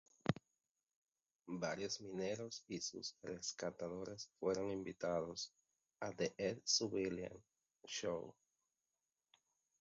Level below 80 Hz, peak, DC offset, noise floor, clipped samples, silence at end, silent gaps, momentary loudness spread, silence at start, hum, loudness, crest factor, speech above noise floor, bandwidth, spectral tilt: -74 dBFS; -20 dBFS; under 0.1%; under -90 dBFS; under 0.1%; 1.5 s; 0.96-1.02 s; 11 LU; 0.25 s; none; -44 LUFS; 26 dB; over 46 dB; 7.6 kHz; -4 dB/octave